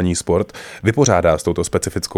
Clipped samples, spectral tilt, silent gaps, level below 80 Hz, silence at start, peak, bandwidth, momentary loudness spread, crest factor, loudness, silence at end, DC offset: under 0.1%; -5 dB/octave; none; -38 dBFS; 0 s; 0 dBFS; 16 kHz; 7 LU; 16 dB; -18 LUFS; 0 s; under 0.1%